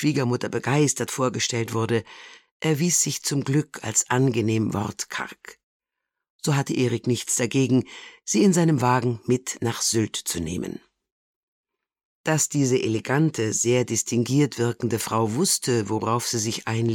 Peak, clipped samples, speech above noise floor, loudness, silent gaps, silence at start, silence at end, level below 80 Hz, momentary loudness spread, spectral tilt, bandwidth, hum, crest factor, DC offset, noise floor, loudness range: -8 dBFS; under 0.1%; 61 dB; -23 LUFS; 2.51-2.60 s, 5.63-5.80 s, 6.30-6.39 s, 11.12-11.64 s, 12.05-12.24 s; 0 s; 0 s; -60 dBFS; 9 LU; -4.5 dB/octave; 17.5 kHz; none; 16 dB; under 0.1%; -84 dBFS; 4 LU